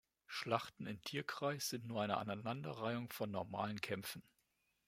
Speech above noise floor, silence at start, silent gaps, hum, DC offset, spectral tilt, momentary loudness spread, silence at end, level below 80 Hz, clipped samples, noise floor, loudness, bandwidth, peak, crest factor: 39 dB; 0.3 s; none; none; under 0.1%; -4.5 dB/octave; 7 LU; 0.65 s; -80 dBFS; under 0.1%; -82 dBFS; -43 LUFS; 16 kHz; -20 dBFS; 24 dB